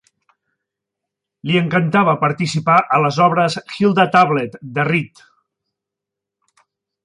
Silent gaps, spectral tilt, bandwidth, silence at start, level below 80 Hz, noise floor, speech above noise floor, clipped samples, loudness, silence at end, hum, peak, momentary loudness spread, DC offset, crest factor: none; -6 dB/octave; 11 kHz; 1.45 s; -62 dBFS; -84 dBFS; 68 dB; under 0.1%; -16 LUFS; 2 s; none; -2 dBFS; 8 LU; under 0.1%; 18 dB